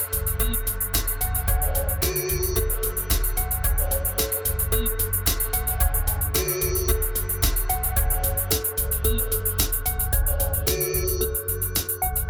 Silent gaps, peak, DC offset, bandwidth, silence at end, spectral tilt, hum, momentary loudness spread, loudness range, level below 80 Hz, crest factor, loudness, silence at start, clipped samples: none; -6 dBFS; under 0.1%; over 20 kHz; 0 s; -3.5 dB/octave; none; 2 LU; 1 LU; -28 dBFS; 16 dB; -23 LUFS; 0 s; under 0.1%